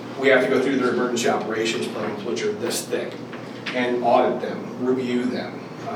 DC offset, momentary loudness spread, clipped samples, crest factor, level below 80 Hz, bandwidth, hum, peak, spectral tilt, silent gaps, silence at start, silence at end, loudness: under 0.1%; 12 LU; under 0.1%; 18 dB; -72 dBFS; 17.5 kHz; none; -4 dBFS; -4 dB/octave; none; 0 s; 0 s; -23 LUFS